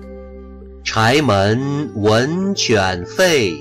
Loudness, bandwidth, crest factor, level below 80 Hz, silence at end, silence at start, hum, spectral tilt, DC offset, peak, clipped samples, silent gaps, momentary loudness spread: -16 LUFS; 16 kHz; 12 dB; -42 dBFS; 0 s; 0 s; none; -4.5 dB/octave; under 0.1%; -6 dBFS; under 0.1%; none; 20 LU